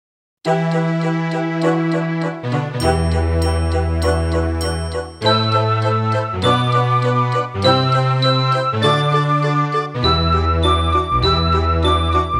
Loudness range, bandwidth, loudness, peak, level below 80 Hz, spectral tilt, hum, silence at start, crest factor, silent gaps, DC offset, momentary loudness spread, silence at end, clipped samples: 3 LU; 13.5 kHz; -17 LUFS; -2 dBFS; -28 dBFS; -6 dB/octave; none; 0.45 s; 16 dB; none; under 0.1%; 5 LU; 0 s; under 0.1%